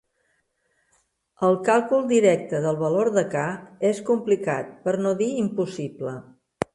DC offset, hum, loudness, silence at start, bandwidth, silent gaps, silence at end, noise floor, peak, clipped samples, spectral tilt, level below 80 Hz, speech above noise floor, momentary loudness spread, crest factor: under 0.1%; none; -23 LUFS; 1.4 s; 11.5 kHz; none; 0.1 s; -70 dBFS; -4 dBFS; under 0.1%; -6 dB/octave; -64 dBFS; 48 dB; 12 LU; 20 dB